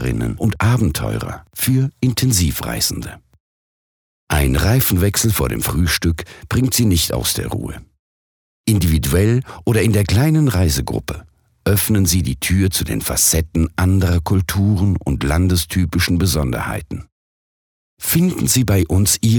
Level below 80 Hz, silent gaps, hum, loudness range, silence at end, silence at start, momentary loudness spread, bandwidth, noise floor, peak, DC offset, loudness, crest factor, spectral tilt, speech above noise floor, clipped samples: -30 dBFS; 3.40-4.27 s, 7.99-8.64 s, 17.12-17.97 s; none; 3 LU; 0 s; 0 s; 10 LU; over 20 kHz; under -90 dBFS; -2 dBFS; under 0.1%; -17 LUFS; 16 dB; -4.5 dB/octave; over 74 dB; under 0.1%